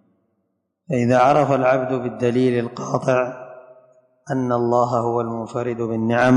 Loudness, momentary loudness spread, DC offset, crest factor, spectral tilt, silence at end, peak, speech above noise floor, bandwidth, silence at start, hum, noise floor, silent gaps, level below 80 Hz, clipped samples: -20 LUFS; 10 LU; under 0.1%; 16 dB; -7 dB/octave; 0 s; -4 dBFS; 54 dB; 10.5 kHz; 0.9 s; none; -72 dBFS; none; -58 dBFS; under 0.1%